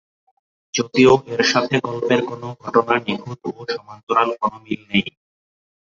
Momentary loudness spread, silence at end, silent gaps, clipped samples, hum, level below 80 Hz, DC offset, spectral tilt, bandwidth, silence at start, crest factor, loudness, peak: 15 LU; 0.85 s; 4.03-4.07 s; under 0.1%; none; -56 dBFS; under 0.1%; -4.5 dB/octave; 7.4 kHz; 0.75 s; 18 dB; -19 LUFS; -2 dBFS